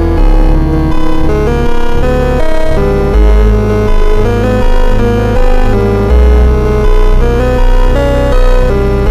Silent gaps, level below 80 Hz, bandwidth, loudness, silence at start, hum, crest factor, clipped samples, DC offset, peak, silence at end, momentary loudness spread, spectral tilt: none; -8 dBFS; 7.6 kHz; -11 LUFS; 0 s; none; 6 dB; under 0.1%; under 0.1%; 0 dBFS; 0 s; 4 LU; -7.5 dB/octave